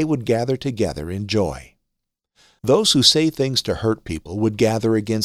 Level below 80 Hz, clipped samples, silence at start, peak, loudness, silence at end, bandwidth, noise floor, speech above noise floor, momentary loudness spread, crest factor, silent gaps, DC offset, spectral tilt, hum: -44 dBFS; under 0.1%; 0 s; -2 dBFS; -19 LUFS; 0 s; 15.5 kHz; -79 dBFS; 59 dB; 14 LU; 18 dB; none; under 0.1%; -4.5 dB/octave; none